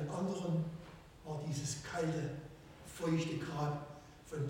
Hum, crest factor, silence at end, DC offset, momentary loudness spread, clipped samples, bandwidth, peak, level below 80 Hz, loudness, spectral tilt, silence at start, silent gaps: none; 16 dB; 0 s; under 0.1%; 17 LU; under 0.1%; 16.5 kHz; -24 dBFS; -64 dBFS; -40 LUFS; -6 dB/octave; 0 s; none